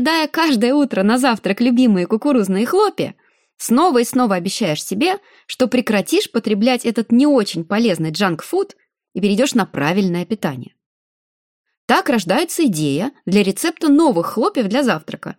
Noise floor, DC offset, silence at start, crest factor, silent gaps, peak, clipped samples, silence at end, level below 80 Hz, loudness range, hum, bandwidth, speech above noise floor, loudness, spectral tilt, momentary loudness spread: under -90 dBFS; under 0.1%; 0 s; 16 dB; 10.86-11.64 s, 11.77-11.88 s; -2 dBFS; under 0.1%; 0.05 s; -64 dBFS; 4 LU; none; 17 kHz; over 74 dB; -17 LUFS; -5 dB/octave; 8 LU